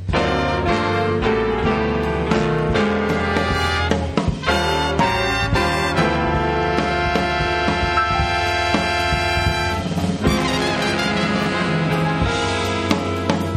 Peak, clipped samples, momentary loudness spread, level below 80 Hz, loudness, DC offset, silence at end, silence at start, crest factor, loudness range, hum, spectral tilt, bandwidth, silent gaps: -2 dBFS; under 0.1%; 2 LU; -32 dBFS; -19 LUFS; under 0.1%; 0 s; 0 s; 16 dB; 1 LU; none; -5.5 dB/octave; 16 kHz; none